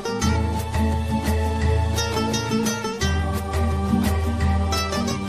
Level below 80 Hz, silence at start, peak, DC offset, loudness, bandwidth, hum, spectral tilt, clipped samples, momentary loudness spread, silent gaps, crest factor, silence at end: -32 dBFS; 0 s; -8 dBFS; under 0.1%; -23 LUFS; 15 kHz; none; -5.5 dB/octave; under 0.1%; 3 LU; none; 14 dB; 0 s